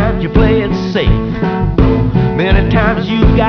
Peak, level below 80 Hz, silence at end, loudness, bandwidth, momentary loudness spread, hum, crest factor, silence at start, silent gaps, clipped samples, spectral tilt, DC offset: -2 dBFS; -18 dBFS; 0 s; -12 LUFS; 5.4 kHz; 4 LU; none; 10 dB; 0 s; none; under 0.1%; -8.5 dB/octave; under 0.1%